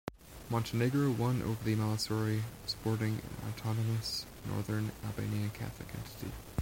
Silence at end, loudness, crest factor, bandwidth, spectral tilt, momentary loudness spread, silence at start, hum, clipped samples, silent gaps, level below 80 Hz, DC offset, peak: 0 s; -35 LUFS; 18 dB; 16.5 kHz; -6 dB/octave; 12 LU; 0.05 s; none; under 0.1%; none; -56 dBFS; under 0.1%; -18 dBFS